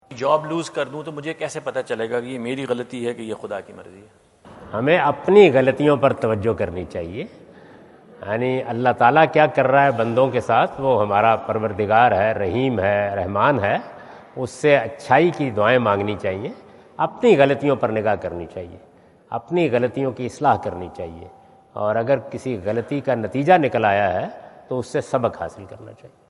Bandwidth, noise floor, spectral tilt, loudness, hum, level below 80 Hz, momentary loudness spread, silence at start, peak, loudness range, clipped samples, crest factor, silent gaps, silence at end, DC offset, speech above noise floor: 11.5 kHz; -46 dBFS; -6.5 dB/octave; -20 LUFS; none; -58 dBFS; 16 LU; 0.1 s; 0 dBFS; 7 LU; under 0.1%; 20 dB; none; 0.25 s; under 0.1%; 26 dB